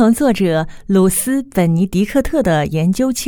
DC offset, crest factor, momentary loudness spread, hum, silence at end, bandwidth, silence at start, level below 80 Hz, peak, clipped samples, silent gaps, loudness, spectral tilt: under 0.1%; 14 dB; 4 LU; none; 0 s; over 20 kHz; 0 s; -34 dBFS; 0 dBFS; under 0.1%; none; -15 LUFS; -6 dB/octave